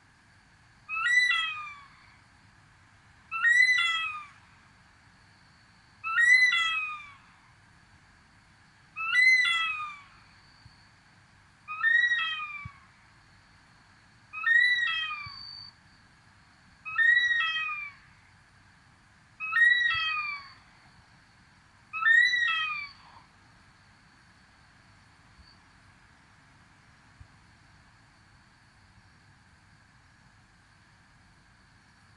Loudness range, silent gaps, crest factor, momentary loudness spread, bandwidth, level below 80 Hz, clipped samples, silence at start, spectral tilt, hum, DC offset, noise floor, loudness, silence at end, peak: 4 LU; none; 20 dB; 22 LU; 11 kHz; -68 dBFS; under 0.1%; 0.9 s; 1 dB/octave; none; under 0.1%; -60 dBFS; -24 LUFS; 9.25 s; -12 dBFS